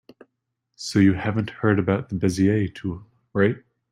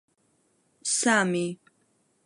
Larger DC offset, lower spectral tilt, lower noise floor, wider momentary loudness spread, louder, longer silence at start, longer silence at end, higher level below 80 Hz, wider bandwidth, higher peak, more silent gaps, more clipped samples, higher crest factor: neither; first, -7 dB/octave vs -3 dB/octave; first, -78 dBFS vs -69 dBFS; about the same, 13 LU vs 13 LU; about the same, -23 LUFS vs -25 LUFS; about the same, 0.8 s vs 0.85 s; second, 0.35 s vs 0.7 s; first, -54 dBFS vs -80 dBFS; about the same, 12 kHz vs 11.5 kHz; first, -6 dBFS vs -10 dBFS; neither; neither; about the same, 18 dB vs 20 dB